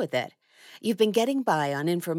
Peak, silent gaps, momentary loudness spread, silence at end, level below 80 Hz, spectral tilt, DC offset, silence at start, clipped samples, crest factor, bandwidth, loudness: -10 dBFS; none; 9 LU; 0 s; under -90 dBFS; -5 dB/octave; under 0.1%; 0 s; under 0.1%; 16 dB; 17 kHz; -26 LUFS